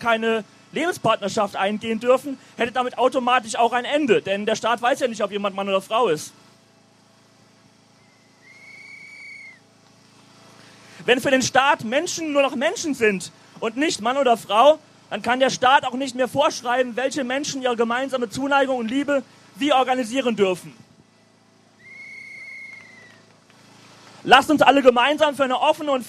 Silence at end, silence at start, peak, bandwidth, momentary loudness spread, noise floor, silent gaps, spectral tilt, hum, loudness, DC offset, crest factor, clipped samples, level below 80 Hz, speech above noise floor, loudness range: 0 s; 0 s; 0 dBFS; 15 kHz; 20 LU; -56 dBFS; none; -3.5 dB/octave; none; -20 LUFS; under 0.1%; 22 dB; under 0.1%; -64 dBFS; 36 dB; 9 LU